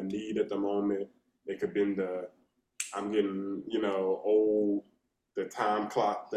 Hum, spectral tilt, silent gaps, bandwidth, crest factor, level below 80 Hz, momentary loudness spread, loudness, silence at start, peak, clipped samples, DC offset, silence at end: none; -5 dB/octave; none; 14.5 kHz; 18 dB; -74 dBFS; 12 LU; -32 LUFS; 0 s; -14 dBFS; under 0.1%; under 0.1%; 0 s